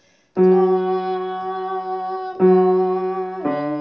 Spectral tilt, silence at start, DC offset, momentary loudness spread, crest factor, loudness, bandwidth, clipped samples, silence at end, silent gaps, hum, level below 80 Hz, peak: -10.5 dB/octave; 0.35 s; under 0.1%; 11 LU; 14 dB; -19 LUFS; 5.6 kHz; under 0.1%; 0 s; none; none; -72 dBFS; -4 dBFS